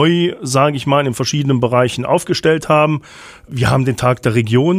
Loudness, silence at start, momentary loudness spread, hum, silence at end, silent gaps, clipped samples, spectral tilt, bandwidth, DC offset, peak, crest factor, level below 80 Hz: -15 LUFS; 0 s; 4 LU; none; 0 s; none; under 0.1%; -5.5 dB/octave; 15 kHz; under 0.1%; -2 dBFS; 14 dB; -44 dBFS